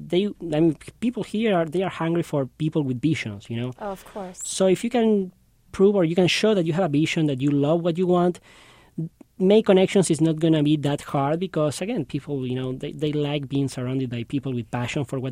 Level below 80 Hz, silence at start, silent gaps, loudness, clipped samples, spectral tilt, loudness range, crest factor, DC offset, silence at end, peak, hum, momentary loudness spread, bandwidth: -56 dBFS; 0 s; none; -23 LUFS; under 0.1%; -6 dB/octave; 5 LU; 16 dB; under 0.1%; 0 s; -6 dBFS; none; 12 LU; 16 kHz